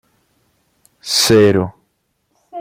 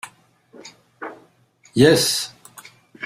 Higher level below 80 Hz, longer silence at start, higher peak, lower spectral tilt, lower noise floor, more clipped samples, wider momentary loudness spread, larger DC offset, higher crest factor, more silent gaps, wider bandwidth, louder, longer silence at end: first, -50 dBFS vs -56 dBFS; first, 1.05 s vs 0.05 s; about the same, 0 dBFS vs -2 dBFS; about the same, -4 dB/octave vs -4 dB/octave; first, -67 dBFS vs -56 dBFS; neither; about the same, 23 LU vs 25 LU; neither; second, 16 dB vs 22 dB; neither; about the same, 16.5 kHz vs 16 kHz; first, -13 LUFS vs -17 LUFS; about the same, 0 s vs 0 s